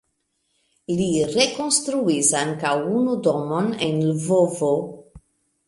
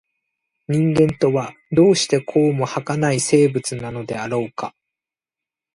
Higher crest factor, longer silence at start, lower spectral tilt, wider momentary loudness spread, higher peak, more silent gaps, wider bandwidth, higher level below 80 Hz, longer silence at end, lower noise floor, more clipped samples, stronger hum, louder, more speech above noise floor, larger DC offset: about the same, 18 dB vs 16 dB; first, 0.9 s vs 0.7 s; second, -4 dB/octave vs -5.5 dB/octave; second, 6 LU vs 12 LU; about the same, -4 dBFS vs -4 dBFS; neither; about the same, 11.5 kHz vs 11.5 kHz; about the same, -58 dBFS vs -54 dBFS; second, 0.5 s vs 1.05 s; second, -72 dBFS vs -88 dBFS; neither; neither; about the same, -21 LUFS vs -19 LUFS; second, 51 dB vs 70 dB; neither